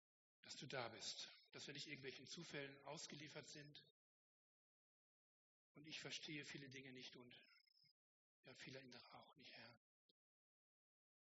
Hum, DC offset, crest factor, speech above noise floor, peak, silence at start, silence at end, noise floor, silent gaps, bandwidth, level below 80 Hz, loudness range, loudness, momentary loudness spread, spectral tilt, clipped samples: none; under 0.1%; 26 dB; over 33 dB; -34 dBFS; 0.45 s; 1.5 s; under -90 dBFS; 3.90-5.75 s, 7.91-8.43 s; 7.6 kHz; under -90 dBFS; 10 LU; -56 LUFS; 14 LU; -2 dB/octave; under 0.1%